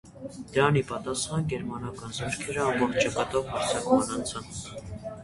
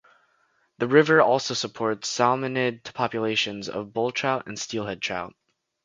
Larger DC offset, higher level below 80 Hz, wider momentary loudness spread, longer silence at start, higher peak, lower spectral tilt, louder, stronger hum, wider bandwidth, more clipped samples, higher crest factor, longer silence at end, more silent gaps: neither; first, -52 dBFS vs -66 dBFS; about the same, 14 LU vs 12 LU; second, 0.05 s vs 0.8 s; second, -6 dBFS vs -2 dBFS; about the same, -4.5 dB/octave vs -4 dB/octave; second, -28 LUFS vs -24 LUFS; neither; first, 11.5 kHz vs 9.4 kHz; neither; about the same, 22 dB vs 22 dB; second, 0 s vs 0.55 s; neither